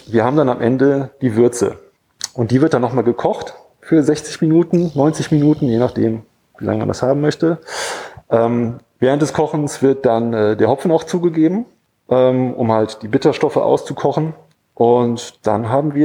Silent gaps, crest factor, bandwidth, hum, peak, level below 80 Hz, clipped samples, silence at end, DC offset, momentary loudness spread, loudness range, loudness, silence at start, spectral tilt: none; 16 dB; 14 kHz; none; 0 dBFS; -54 dBFS; under 0.1%; 0 s; under 0.1%; 8 LU; 2 LU; -16 LUFS; 0.05 s; -6.5 dB/octave